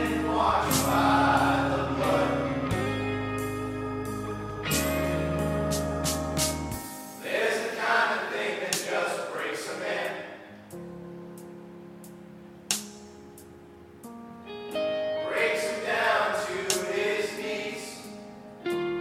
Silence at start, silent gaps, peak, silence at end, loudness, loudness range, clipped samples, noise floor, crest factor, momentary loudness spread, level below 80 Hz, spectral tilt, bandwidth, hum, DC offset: 0 s; none; -6 dBFS; 0 s; -28 LUFS; 12 LU; under 0.1%; -49 dBFS; 22 dB; 21 LU; -46 dBFS; -4 dB/octave; 16.5 kHz; none; under 0.1%